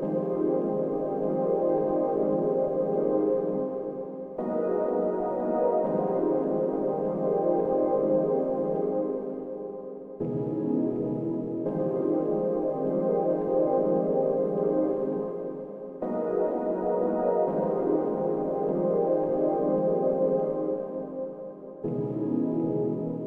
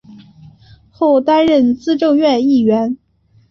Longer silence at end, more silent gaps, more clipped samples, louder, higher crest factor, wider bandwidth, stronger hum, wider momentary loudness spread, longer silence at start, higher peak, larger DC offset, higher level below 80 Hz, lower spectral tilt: second, 0 s vs 0.55 s; neither; neither; second, -27 LUFS vs -13 LUFS; about the same, 14 dB vs 12 dB; second, 3.1 kHz vs 6.8 kHz; neither; first, 9 LU vs 6 LU; second, 0 s vs 0.15 s; second, -12 dBFS vs -2 dBFS; neither; second, -62 dBFS vs -54 dBFS; first, -12 dB/octave vs -6.5 dB/octave